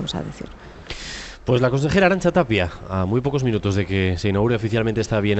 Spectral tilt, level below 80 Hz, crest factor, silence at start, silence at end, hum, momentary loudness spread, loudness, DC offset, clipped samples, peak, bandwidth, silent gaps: -6.5 dB/octave; -42 dBFS; 16 dB; 0 s; 0 s; none; 16 LU; -20 LUFS; under 0.1%; under 0.1%; -4 dBFS; 8.4 kHz; none